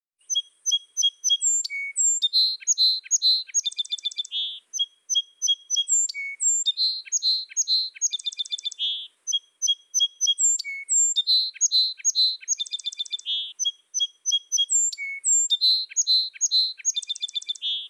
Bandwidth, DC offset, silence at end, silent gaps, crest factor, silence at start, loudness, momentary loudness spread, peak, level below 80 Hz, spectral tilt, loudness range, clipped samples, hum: 16 kHz; under 0.1%; 0 s; none; 14 dB; 0.3 s; -22 LUFS; 9 LU; -12 dBFS; under -90 dBFS; 9 dB/octave; 3 LU; under 0.1%; none